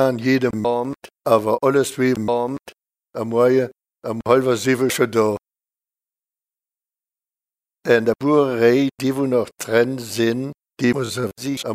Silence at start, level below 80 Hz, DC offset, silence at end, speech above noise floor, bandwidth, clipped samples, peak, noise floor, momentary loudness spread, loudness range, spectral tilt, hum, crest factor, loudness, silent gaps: 0 s; -60 dBFS; under 0.1%; 0 s; over 71 dB; 16 kHz; under 0.1%; 0 dBFS; under -90 dBFS; 12 LU; 5 LU; -5.5 dB/octave; none; 20 dB; -19 LUFS; none